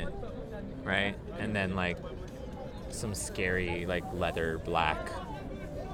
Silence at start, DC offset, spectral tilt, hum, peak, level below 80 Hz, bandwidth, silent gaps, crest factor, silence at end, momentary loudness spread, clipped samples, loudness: 0 s; under 0.1%; -4.5 dB/octave; none; -10 dBFS; -46 dBFS; 18 kHz; none; 24 dB; 0 s; 12 LU; under 0.1%; -34 LUFS